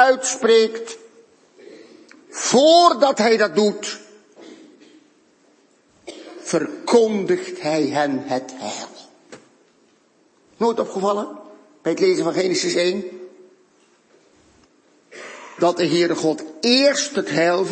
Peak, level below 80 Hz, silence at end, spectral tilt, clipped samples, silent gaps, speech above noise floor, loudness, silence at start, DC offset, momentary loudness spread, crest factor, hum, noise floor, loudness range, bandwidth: -2 dBFS; -74 dBFS; 0 s; -3.5 dB/octave; under 0.1%; none; 40 dB; -19 LUFS; 0 s; under 0.1%; 20 LU; 20 dB; none; -58 dBFS; 9 LU; 8.8 kHz